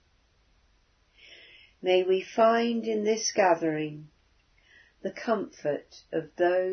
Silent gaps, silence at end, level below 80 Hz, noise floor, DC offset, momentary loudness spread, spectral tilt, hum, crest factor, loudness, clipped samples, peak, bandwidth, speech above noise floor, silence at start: none; 0 s; -70 dBFS; -66 dBFS; under 0.1%; 13 LU; -4 dB/octave; none; 18 dB; -27 LUFS; under 0.1%; -10 dBFS; 6.6 kHz; 40 dB; 1.85 s